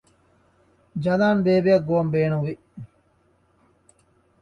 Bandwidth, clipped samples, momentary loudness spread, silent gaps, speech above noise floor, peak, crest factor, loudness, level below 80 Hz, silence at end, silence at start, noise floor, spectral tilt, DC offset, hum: 8.6 kHz; under 0.1%; 20 LU; none; 42 dB; -8 dBFS; 18 dB; -21 LUFS; -58 dBFS; 1.55 s; 0.95 s; -63 dBFS; -8.5 dB/octave; under 0.1%; none